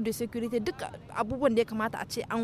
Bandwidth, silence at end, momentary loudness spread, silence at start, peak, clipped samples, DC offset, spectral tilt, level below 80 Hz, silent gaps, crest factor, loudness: 15.5 kHz; 0 s; 9 LU; 0 s; -12 dBFS; under 0.1%; under 0.1%; -5 dB/octave; -56 dBFS; none; 18 dB; -31 LUFS